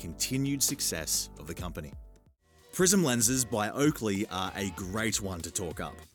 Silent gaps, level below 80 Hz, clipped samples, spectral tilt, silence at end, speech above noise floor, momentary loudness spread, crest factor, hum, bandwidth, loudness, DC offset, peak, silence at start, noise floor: none; -52 dBFS; under 0.1%; -3.5 dB/octave; 0.1 s; 31 dB; 15 LU; 20 dB; none; 19.5 kHz; -29 LUFS; under 0.1%; -10 dBFS; 0 s; -62 dBFS